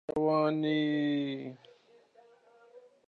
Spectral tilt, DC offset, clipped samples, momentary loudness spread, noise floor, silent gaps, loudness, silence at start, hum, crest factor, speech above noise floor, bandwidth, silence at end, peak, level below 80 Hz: -8 dB/octave; under 0.1%; under 0.1%; 12 LU; -62 dBFS; none; -30 LUFS; 0.1 s; none; 16 dB; 32 dB; 6.2 kHz; 0.3 s; -16 dBFS; -72 dBFS